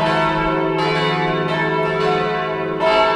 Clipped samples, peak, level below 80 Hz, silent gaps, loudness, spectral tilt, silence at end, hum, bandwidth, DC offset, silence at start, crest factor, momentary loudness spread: under 0.1%; -4 dBFS; -42 dBFS; none; -18 LUFS; -6 dB/octave; 0 s; none; 11 kHz; under 0.1%; 0 s; 14 dB; 3 LU